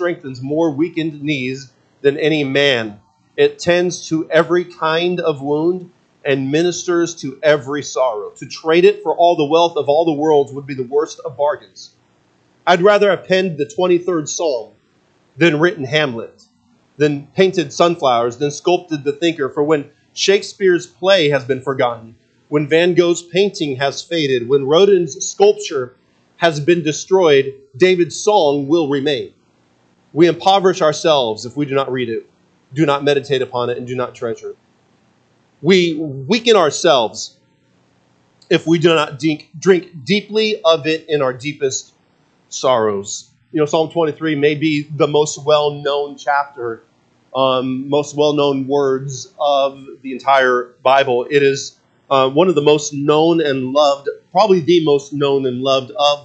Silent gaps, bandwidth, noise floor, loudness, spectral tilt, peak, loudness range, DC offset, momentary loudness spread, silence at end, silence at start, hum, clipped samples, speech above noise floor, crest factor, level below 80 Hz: none; 8.8 kHz; -57 dBFS; -16 LUFS; -4.5 dB/octave; 0 dBFS; 4 LU; under 0.1%; 10 LU; 0.05 s; 0 s; none; under 0.1%; 42 dB; 16 dB; -66 dBFS